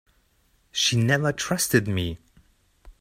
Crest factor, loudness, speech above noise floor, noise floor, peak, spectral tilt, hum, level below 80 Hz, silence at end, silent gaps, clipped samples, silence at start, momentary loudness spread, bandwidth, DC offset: 22 dB; -23 LUFS; 42 dB; -65 dBFS; -4 dBFS; -4 dB/octave; none; -52 dBFS; 0.1 s; none; under 0.1%; 0.75 s; 11 LU; 16 kHz; under 0.1%